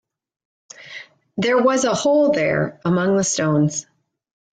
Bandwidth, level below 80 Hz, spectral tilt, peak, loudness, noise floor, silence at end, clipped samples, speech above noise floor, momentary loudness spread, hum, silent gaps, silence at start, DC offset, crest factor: 9.6 kHz; -58 dBFS; -5 dB/octave; -6 dBFS; -18 LUFS; -40 dBFS; 0.7 s; under 0.1%; 22 dB; 19 LU; none; none; 0.8 s; under 0.1%; 14 dB